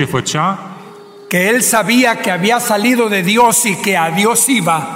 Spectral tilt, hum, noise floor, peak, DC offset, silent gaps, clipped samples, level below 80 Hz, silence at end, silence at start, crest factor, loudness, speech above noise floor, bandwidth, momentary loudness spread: -3 dB/octave; none; -35 dBFS; -2 dBFS; under 0.1%; none; under 0.1%; -56 dBFS; 0 s; 0 s; 12 dB; -12 LUFS; 22 dB; 16.5 kHz; 6 LU